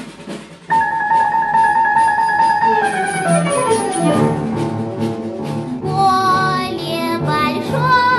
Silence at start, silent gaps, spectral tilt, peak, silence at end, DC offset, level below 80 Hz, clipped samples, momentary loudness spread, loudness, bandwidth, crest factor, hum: 0 s; none; -5 dB/octave; -4 dBFS; 0 s; under 0.1%; -50 dBFS; under 0.1%; 10 LU; -16 LUFS; 12.5 kHz; 12 dB; none